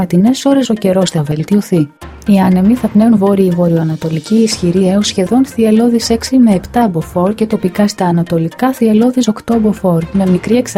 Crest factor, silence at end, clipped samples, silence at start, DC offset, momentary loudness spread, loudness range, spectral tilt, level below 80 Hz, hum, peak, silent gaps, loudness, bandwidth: 10 dB; 0 s; under 0.1%; 0 s; under 0.1%; 5 LU; 2 LU; -6.5 dB/octave; -40 dBFS; none; 0 dBFS; none; -12 LUFS; 15.5 kHz